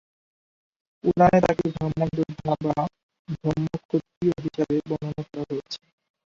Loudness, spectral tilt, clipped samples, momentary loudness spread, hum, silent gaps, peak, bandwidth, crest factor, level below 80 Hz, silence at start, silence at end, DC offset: -25 LUFS; -8 dB/octave; under 0.1%; 14 LU; none; 3.03-3.09 s, 3.19-3.25 s, 3.85-3.89 s, 4.17-4.21 s; -4 dBFS; 7.6 kHz; 20 dB; -52 dBFS; 1.05 s; 0.5 s; under 0.1%